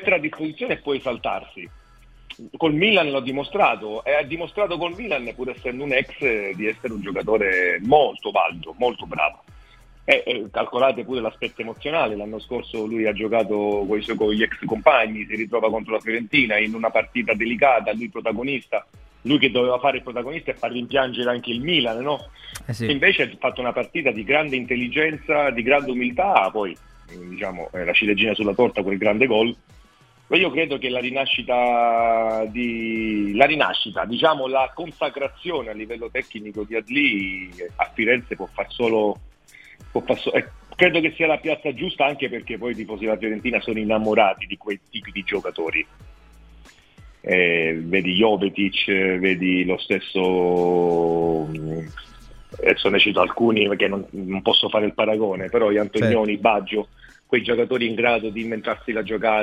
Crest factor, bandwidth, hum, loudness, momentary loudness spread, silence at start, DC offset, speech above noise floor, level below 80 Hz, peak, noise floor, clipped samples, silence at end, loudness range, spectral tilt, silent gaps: 22 dB; 12.5 kHz; none; -21 LUFS; 11 LU; 0 s; under 0.1%; 32 dB; -50 dBFS; 0 dBFS; -54 dBFS; under 0.1%; 0 s; 4 LU; -6 dB/octave; none